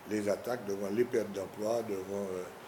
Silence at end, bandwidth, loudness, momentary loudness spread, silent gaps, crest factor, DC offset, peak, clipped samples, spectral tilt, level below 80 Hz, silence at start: 0 s; 19.5 kHz; -35 LUFS; 6 LU; none; 18 dB; under 0.1%; -18 dBFS; under 0.1%; -5.5 dB/octave; -74 dBFS; 0 s